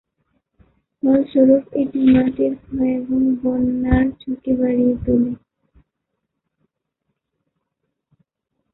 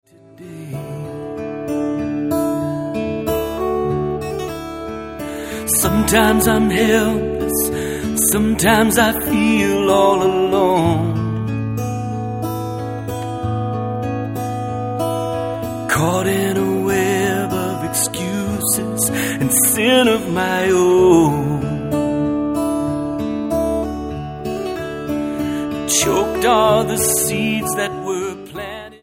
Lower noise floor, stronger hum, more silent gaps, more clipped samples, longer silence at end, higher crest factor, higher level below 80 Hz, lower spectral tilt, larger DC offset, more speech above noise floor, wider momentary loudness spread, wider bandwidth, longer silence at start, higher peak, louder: first, -77 dBFS vs -39 dBFS; neither; neither; neither; first, 3.4 s vs 0.05 s; about the same, 18 dB vs 18 dB; about the same, -38 dBFS vs -38 dBFS; first, -12.5 dB/octave vs -4.5 dB/octave; neither; first, 60 dB vs 24 dB; second, 8 LU vs 12 LU; second, 4.1 kHz vs 16.5 kHz; first, 1.05 s vs 0.4 s; about the same, -2 dBFS vs 0 dBFS; about the same, -18 LUFS vs -18 LUFS